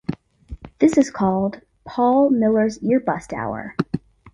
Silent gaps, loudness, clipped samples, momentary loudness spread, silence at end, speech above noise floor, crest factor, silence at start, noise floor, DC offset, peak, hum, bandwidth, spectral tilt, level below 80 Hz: none; -20 LUFS; under 0.1%; 16 LU; 0.05 s; 21 dB; 18 dB; 0.1 s; -39 dBFS; under 0.1%; -4 dBFS; none; 11 kHz; -7 dB/octave; -48 dBFS